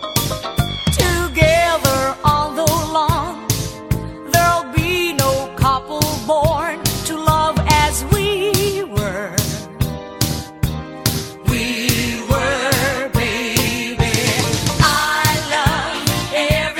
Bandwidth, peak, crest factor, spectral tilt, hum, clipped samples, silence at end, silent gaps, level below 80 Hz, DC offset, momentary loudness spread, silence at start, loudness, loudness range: 19 kHz; 0 dBFS; 18 dB; -4 dB/octave; none; under 0.1%; 0 s; none; -30 dBFS; under 0.1%; 7 LU; 0 s; -17 LUFS; 4 LU